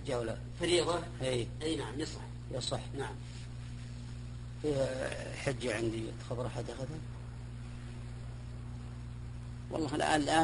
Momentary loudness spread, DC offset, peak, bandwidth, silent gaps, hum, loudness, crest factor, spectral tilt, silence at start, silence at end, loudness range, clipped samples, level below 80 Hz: 14 LU; under 0.1%; -14 dBFS; 11 kHz; none; 60 Hz at -45 dBFS; -37 LUFS; 24 dB; -5 dB/octave; 0 s; 0 s; 7 LU; under 0.1%; -50 dBFS